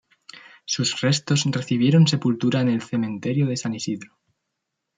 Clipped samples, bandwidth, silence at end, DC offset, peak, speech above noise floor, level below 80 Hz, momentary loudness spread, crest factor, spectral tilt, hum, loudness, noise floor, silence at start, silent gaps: under 0.1%; 9.4 kHz; 0.9 s; under 0.1%; -8 dBFS; 59 dB; -66 dBFS; 11 LU; 16 dB; -5.5 dB/octave; none; -22 LUFS; -80 dBFS; 0.35 s; none